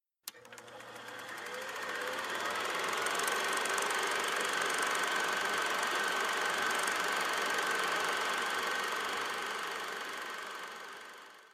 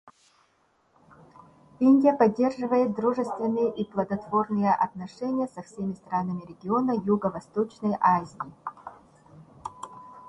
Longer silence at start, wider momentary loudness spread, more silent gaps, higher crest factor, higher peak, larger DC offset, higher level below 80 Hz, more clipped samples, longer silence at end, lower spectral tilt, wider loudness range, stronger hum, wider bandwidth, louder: first, 0.25 s vs 0.05 s; second, 15 LU vs 19 LU; neither; about the same, 20 dB vs 18 dB; second, -16 dBFS vs -8 dBFS; neither; second, -78 dBFS vs -66 dBFS; neither; about the same, 0.05 s vs 0 s; second, 0 dB/octave vs -8 dB/octave; about the same, 4 LU vs 4 LU; neither; first, 15.5 kHz vs 10 kHz; second, -33 LUFS vs -26 LUFS